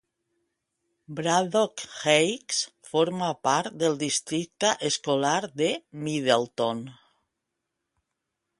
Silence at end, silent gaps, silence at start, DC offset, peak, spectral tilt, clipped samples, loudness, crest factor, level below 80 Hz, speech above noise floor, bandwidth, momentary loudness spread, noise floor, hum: 1.65 s; none; 1.1 s; under 0.1%; -6 dBFS; -3 dB/octave; under 0.1%; -26 LUFS; 22 dB; -72 dBFS; 57 dB; 11.5 kHz; 8 LU; -83 dBFS; none